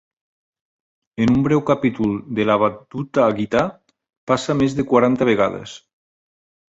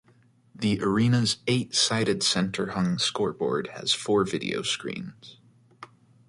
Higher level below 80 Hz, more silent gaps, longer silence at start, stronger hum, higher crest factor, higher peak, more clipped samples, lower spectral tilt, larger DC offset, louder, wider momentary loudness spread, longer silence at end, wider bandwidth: first, -50 dBFS vs -60 dBFS; first, 4.17-4.27 s vs none; first, 1.2 s vs 0.6 s; neither; about the same, 18 dB vs 18 dB; first, -2 dBFS vs -10 dBFS; neither; first, -7 dB/octave vs -4 dB/octave; neither; first, -19 LUFS vs -25 LUFS; first, 11 LU vs 7 LU; first, 0.9 s vs 0.45 s; second, 8 kHz vs 11.5 kHz